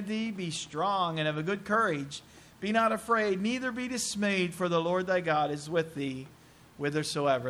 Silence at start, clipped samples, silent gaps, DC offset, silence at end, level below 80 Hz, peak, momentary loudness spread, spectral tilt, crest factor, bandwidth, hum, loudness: 0 s; under 0.1%; none; under 0.1%; 0 s; -66 dBFS; -14 dBFS; 9 LU; -4.5 dB/octave; 18 dB; 14.5 kHz; none; -30 LUFS